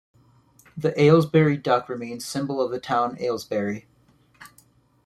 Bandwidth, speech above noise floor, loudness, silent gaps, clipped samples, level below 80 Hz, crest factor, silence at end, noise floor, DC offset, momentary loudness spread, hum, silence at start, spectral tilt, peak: 14 kHz; 37 dB; -23 LUFS; none; under 0.1%; -62 dBFS; 20 dB; 0.6 s; -59 dBFS; under 0.1%; 14 LU; none; 0.75 s; -6.5 dB/octave; -4 dBFS